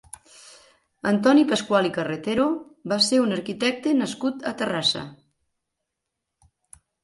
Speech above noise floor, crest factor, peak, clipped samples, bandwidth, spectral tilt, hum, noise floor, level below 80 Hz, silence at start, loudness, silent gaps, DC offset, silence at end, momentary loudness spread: 60 dB; 18 dB; -6 dBFS; under 0.1%; 11.5 kHz; -4 dB/octave; none; -82 dBFS; -64 dBFS; 1.05 s; -23 LUFS; none; under 0.1%; 1.9 s; 12 LU